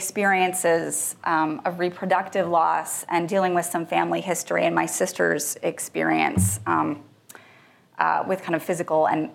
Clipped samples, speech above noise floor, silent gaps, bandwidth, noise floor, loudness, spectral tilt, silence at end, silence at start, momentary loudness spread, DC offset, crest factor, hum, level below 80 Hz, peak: under 0.1%; 31 dB; none; 16.5 kHz; -54 dBFS; -23 LUFS; -4 dB/octave; 0 s; 0 s; 5 LU; under 0.1%; 20 dB; none; -66 dBFS; -4 dBFS